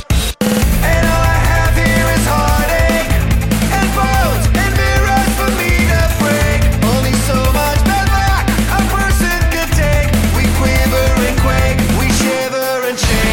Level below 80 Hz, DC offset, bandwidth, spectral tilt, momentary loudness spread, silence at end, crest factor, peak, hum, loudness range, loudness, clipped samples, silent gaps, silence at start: -16 dBFS; under 0.1%; 17 kHz; -5 dB/octave; 2 LU; 0 s; 10 dB; -2 dBFS; none; 0 LU; -13 LUFS; under 0.1%; none; 0 s